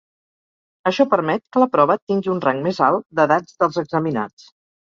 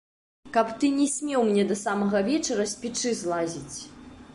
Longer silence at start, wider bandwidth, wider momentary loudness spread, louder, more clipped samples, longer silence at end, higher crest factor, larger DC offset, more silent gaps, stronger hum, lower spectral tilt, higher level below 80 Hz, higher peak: first, 0.85 s vs 0.45 s; second, 7.4 kHz vs 11.5 kHz; second, 7 LU vs 10 LU; first, -19 LUFS vs -26 LUFS; neither; first, 0.6 s vs 0 s; about the same, 18 dB vs 18 dB; neither; first, 2.02-2.07 s vs none; neither; first, -7 dB/octave vs -4 dB/octave; about the same, -64 dBFS vs -60 dBFS; first, -2 dBFS vs -10 dBFS